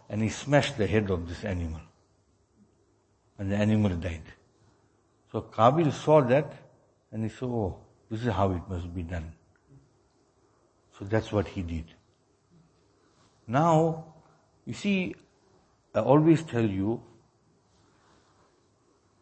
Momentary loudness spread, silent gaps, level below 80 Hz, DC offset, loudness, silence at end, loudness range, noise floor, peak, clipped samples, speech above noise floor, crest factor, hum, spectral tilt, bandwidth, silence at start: 17 LU; none; -52 dBFS; under 0.1%; -28 LUFS; 2.2 s; 9 LU; -67 dBFS; -6 dBFS; under 0.1%; 41 dB; 24 dB; none; -7 dB/octave; 8.8 kHz; 0.1 s